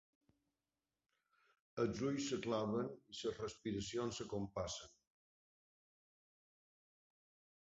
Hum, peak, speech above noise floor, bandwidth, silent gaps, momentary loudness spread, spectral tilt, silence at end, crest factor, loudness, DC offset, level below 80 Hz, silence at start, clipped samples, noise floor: none; -26 dBFS; over 48 dB; 7.6 kHz; none; 7 LU; -5 dB/octave; 2.85 s; 20 dB; -43 LUFS; under 0.1%; -70 dBFS; 1.75 s; under 0.1%; under -90 dBFS